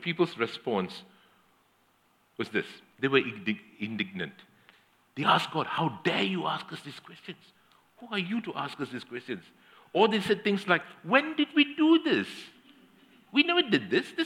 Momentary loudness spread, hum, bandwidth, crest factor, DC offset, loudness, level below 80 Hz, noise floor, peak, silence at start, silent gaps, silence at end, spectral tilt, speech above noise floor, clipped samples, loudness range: 19 LU; none; 14 kHz; 24 dB; under 0.1%; -28 LUFS; -80 dBFS; -67 dBFS; -6 dBFS; 0 s; none; 0 s; -5.5 dB/octave; 39 dB; under 0.1%; 7 LU